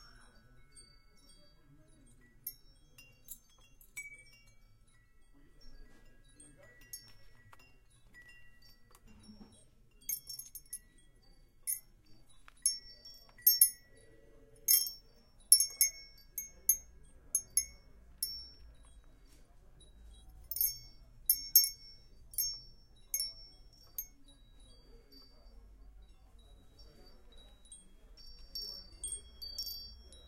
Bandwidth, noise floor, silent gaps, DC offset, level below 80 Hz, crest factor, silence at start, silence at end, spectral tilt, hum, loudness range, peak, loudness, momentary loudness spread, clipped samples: 16 kHz; -63 dBFS; none; under 0.1%; -60 dBFS; 34 dB; 0.75 s; 0.1 s; 1.5 dB/octave; none; 24 LU; -8 dBFS; -32 LUFS; 27 LU; under 0.1%